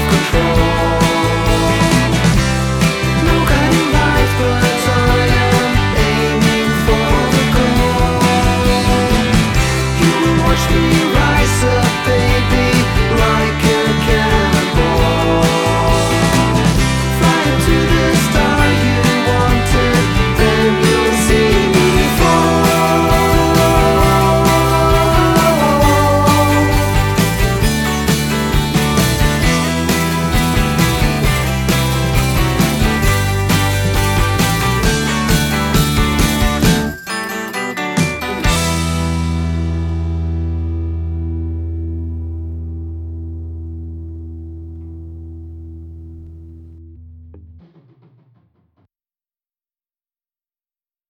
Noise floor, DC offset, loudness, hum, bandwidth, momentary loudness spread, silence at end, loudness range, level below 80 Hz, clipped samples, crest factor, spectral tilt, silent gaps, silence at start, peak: under -90 dBFS; under 0.1%; -13 LUFS; none; over 20 kHz; 11 LU; 3.7 s; 11 LU; -22 dBFS; under 0.1%; 14 dB; -5 dB/octave; none; 0 s; 0 dBFS